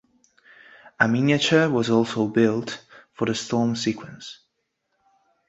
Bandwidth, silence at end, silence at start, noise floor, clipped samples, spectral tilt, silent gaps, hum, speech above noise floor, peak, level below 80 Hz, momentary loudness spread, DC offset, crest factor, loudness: 8 kHz; 1.15 s; 1 s; -75 dBFS; under 0.1%; -5 dB/octave; none; none; 53 dB; -4 dBFS; -62 dBFS; 18 LU; under 0.1%; 20 dB; -22 LUFS